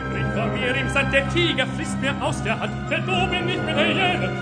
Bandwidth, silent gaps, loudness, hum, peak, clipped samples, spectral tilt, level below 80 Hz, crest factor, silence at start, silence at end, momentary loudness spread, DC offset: 10 kHz; none; -22 LUFS; none; -4 dBFS; under 0.1%; -5 dB/octave; -38 dBFS; 18 dB; 0 s; 0 s; 6 LU; under 0.1%